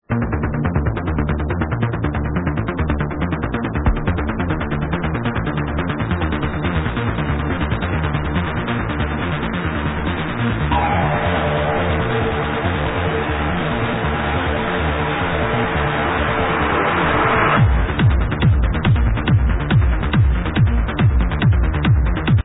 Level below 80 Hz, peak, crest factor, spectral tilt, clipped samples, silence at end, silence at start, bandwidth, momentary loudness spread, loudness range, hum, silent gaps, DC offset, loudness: -24 dBFS; -4 dBFS; 14 dB; -11 dB/octave; under 0.1%; 0.05 s; 0.1 s; 4 kHz; 5 LU; 5 LU; none; none; under 0.1%; -19 LUFS